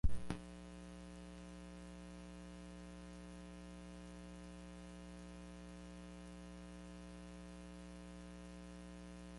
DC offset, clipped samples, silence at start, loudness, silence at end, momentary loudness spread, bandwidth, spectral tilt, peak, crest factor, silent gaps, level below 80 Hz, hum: under 0.1%; under 0.1%; 0.05 s; -54 LUFS; 0 s; 0 LU; 11.5 kHz; -6 dB/octave; -22 dBFS; 26 dB; none; -54 dBFS; 60 Hz at -55 dBFS